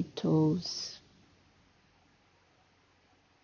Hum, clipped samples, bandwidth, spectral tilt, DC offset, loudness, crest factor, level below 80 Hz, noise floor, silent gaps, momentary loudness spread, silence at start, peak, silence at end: none; under 0.1%; 7 kHz; -6.5 dB/octave; under 0.1%; -31 LUFS; 18 dB; -68 dBFS; -67 dBFS; none; 15 LU; 0 s; -18 dBFS; 2.45 s